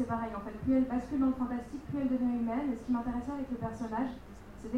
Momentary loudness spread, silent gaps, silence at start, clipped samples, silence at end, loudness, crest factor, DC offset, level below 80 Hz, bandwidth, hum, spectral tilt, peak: 9 LU; none; 0 s; under 0.1%; 0 s; -34 LUFS; 14 dB; under 0.1%; -52 dBFS; 8.8 kHz; none; -8 dB/octave; -18 dBFS